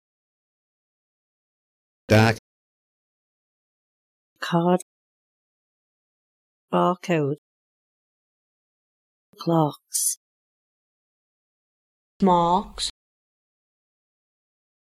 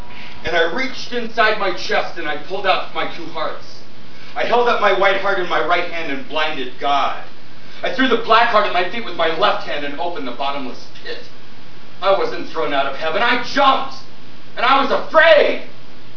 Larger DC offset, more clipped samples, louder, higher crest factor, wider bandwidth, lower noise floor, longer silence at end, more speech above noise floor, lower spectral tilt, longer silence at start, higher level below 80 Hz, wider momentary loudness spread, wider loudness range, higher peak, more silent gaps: second, under 0.1% vs 10%; neither; second, -23 LUFS vs -18 LUFS; about the same, 22 dB vs 20 dB; first, 16 kHz vs 5.4 kHz; first, under -90 dBFS vs -42 dBFS; first, 2.05 s vs 0.15 s; first, over 69 dB vs 24 dB; about the same, -5 dB/octave vs -4 dB/octave; first, 2.1 s vs 0 s; about the same, -56 dBFS vs -54 dBFS; second, 13 LU vs 16 LU; about the same, 4 LU vs 6 LU; second, -6 dBFS vs 0 dBFS; first, 2.39-4.36 s, 4.82-6.68 s, 7.38-9.33 s, 10.17-12.20 s vs none